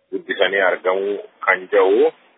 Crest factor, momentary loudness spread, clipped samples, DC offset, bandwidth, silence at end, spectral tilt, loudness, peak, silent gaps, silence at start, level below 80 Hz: 18 dB; 7 LU; under 0.1%; under 0.1%; 4 kHz; 0.25 s; -7.5 dB/octave; -18 LUFS; 0 dBFS; none; 0.1 s; -82 dBFS